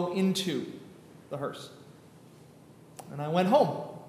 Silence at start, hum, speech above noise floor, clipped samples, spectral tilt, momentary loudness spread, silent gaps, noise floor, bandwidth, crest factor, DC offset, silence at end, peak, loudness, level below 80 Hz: 0 s; none; 25 dB; under 0.1%; -6 dB/octave; 24 LU; none; -54 dBFS; 15.5 kHz; 20 dB; under 0.1%; 0 s; -12 dBFS; -29 LUFS; -78 dBFS